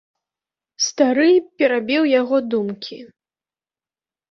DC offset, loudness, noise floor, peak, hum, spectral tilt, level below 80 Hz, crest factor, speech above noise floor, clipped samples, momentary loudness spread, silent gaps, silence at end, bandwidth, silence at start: under 0.1%; -18 LUFS; under -90 dBFS; -4 dBFS; none; -3.5 dB/octave; -70 dBFS; 18 dB; over 72 dB; under 0.1%; 11 LU; none; 1.25 s; 7.6 kHz; 0.8 s